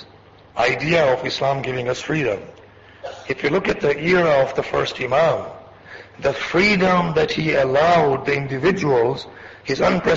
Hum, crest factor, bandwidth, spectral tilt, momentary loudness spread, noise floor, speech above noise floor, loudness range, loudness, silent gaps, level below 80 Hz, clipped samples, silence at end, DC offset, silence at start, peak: none; 14 dB; 7.8 kHz; -5.5 dB/octave; 15 LU; -47 dBFS; 28 dB; 4 LU; -19 LUFS; none; -48 dBFS; under 0.1%; 0 s; under 0.1%; 0 s; -6 dBFS